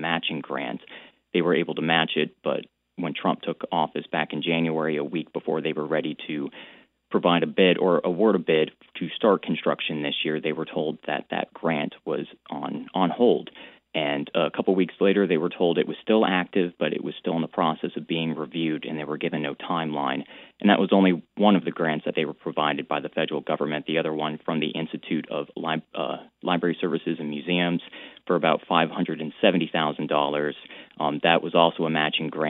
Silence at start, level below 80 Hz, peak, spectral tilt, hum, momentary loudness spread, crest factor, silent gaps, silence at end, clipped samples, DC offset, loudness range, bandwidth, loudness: 0 s; -74 dBFS; -2 dBFS; -9.5 dB/octave; none; 11 LU; 24 dB; none; 0 s; under 0.1%; under 0.1%; 5 LU; 4.2 kHz; -25 LUFS